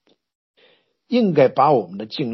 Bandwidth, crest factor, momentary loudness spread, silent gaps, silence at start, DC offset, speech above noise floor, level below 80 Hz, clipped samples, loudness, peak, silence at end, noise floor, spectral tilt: 6 kHz; 18 dB; 11 LU; none; 1.1 s; under 0.1%; 41 dB; -72 dBFS; under 0.1%; -18 LUFS; -2 dBFS; 0 s; -58 dBFS; -8.5 dB/octave